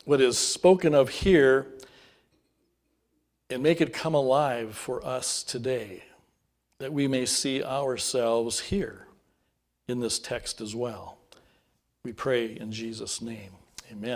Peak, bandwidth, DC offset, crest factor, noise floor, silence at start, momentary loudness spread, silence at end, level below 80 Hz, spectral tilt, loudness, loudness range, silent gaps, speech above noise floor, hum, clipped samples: -6 dBFS; 16 kHz; under 0.1%; 22 dB; -75 dBFS; 0.05 s; 22 LU; 0 s; -52 dBFS; -4 dB/octave; -26 LUFS; 9 LU; none; 49 dB; none; under 0.1%